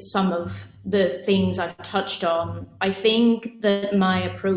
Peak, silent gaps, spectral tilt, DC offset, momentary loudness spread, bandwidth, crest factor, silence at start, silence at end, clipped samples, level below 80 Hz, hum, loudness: -8 dBFS; none; -10.5 dB/octave; under 0.1%; 9 LU; 4 kHz; 16 dB; 0 s; 0 s; under 0.1%; -50 dBFS; none; -23 LUFS